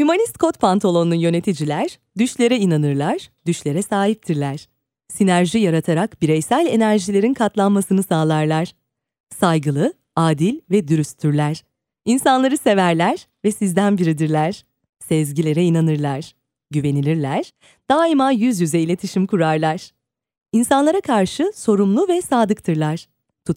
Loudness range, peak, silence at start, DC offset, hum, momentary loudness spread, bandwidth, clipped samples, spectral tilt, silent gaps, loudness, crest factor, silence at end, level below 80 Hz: 2 LU; -2 dBFS; 0 s; under 0.1%; none; 8 LU; 16 kHz; under 0.1%; -6 dB/octave; 9.20-9.24 s, 14.89-14.93 s; -18 LUFS; 16 dB; 0 s; -58 dBFS